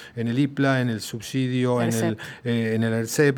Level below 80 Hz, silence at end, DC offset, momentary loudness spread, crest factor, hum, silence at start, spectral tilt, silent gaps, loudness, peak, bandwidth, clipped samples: -66 dBFS; 0 s; under 0.1%; 6 LU; 18 dB; none; 0 s; -6 dB/octave; none; -24 LUFS; -6 dBFS; over 20 kHz; under 0.1%